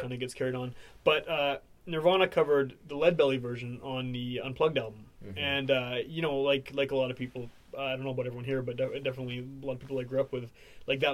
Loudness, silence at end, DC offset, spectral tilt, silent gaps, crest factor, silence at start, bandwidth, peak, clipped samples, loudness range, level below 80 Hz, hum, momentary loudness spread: -31 LUFS; 0 s; under 0.1%; -6 dB/octave; none; 22 dB; 0 s; 14.5 kHz; -10 dBFS; under 0.1%; 6 LU; -60 dBFS; none; 13 LU